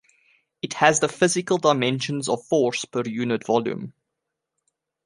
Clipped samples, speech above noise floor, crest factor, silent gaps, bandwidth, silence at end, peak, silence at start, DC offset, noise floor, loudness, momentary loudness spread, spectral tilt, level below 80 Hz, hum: under 0.1%; 60 dB; 22 dB; none; 11.5 kHz; 1.15 s; -2 dBFS; 0.65 s; under 0.1%; -82 dBFS; -22 LUFS; 13 LU; -4 dB/octave; -66 dBFS; none